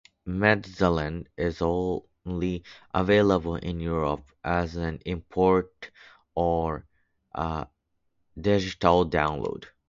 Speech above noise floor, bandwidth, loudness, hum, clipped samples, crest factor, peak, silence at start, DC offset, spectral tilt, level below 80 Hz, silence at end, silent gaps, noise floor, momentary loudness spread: 47 dB; 7.6 kHz; -27 LUFS; none; under 0.1%; 22 dB; -4 dBFS; 0.25 s; under 0.1%; -7 dB/octave; -44 dBFS; 0.2 s; none; -73 dBFS; 13 LU